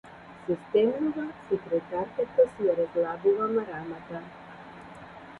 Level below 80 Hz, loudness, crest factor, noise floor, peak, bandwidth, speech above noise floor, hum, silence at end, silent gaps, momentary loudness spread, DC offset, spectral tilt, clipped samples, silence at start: -64 dBFS; -28 LUFS; 18 dB; -46 dBFS; -10 dBFS; 4.5 kHz; 18 dB; none; 0 s; none; 21 LU; under 0.1%; -8 dB/octave; under 0.1%; 0.05 s